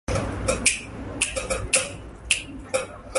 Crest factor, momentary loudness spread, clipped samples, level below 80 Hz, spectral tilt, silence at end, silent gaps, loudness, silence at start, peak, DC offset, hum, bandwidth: 24 dB; 9 LU; under 0.1%; -38 dBFS; -2.5 dB/octave; 0 s; none; -25 LUFS; 0.1 s; -2 dBFS; under 0.1%; none; 12 kHz